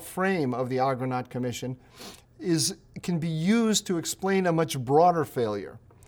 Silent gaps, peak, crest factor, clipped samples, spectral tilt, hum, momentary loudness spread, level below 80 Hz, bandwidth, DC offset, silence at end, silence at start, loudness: none; -8 dBFS; 18 dB; under 0.1%; -5 dB/octave; none; 15 LU; -62 dBFS; over 20 kHz; under 0.1%; 0.3 s; 0 s; -26 LUFS